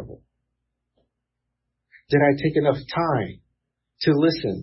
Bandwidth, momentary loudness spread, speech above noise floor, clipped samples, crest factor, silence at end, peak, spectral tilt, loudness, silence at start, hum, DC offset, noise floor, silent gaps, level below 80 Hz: 5.8 kHz; 7 LU; 60 dB; under 0.1%; 18 dB; 0 s; -6 dBFS; -10 dB/octave; -21 LUFS; 0 s; 60 Hz at -55 dBFS; under 0.1%; -80 dBFS; none; -54 dBFS